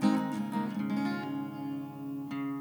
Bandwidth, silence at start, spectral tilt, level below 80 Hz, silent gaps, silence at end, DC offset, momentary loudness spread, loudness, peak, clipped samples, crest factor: over 20 kHz; 0 s; -7 dB/octave; -78 dBFS; none; 0 s; under 0.1%; 7 LU; -35 LUFS; -16 dBFS; under 0.1%; 18 dB